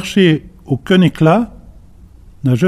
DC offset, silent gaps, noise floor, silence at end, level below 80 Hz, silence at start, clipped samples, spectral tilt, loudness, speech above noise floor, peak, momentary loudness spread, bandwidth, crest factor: under 0.1%; none; -40 dBFS; 0 s; -42 dBFS; 0 s; under 0.1%; -7 dB/octave; -14 LUFS; 28 dB; 0 dBFS; 11 LU; 13.5 kHz; 14 dB